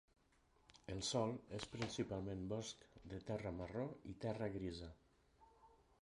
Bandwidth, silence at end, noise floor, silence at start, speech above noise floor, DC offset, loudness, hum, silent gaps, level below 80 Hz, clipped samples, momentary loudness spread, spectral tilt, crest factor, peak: 11.5 kHz; 0.25 s; -76 dBFS; 0.75 s; 30 dB; under 0.1%; -46 LUFS; none; none; -66 dBFS; under 0.1%; 12 LU; -5 dB/octave; 20 dB; -28 dBFS